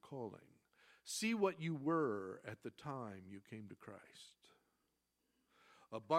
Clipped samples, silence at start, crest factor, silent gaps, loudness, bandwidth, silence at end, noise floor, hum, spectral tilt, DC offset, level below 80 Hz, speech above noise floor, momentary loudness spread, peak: under 0.1%; 0.05 s; 22 dB; none; -43 LUFS; 15.5 kHz; 0 s; -85 dBFS; none; -5 dB/octave; under 0.1%; -88 dBFS; 42 dB; 21 LU; -22 dBFS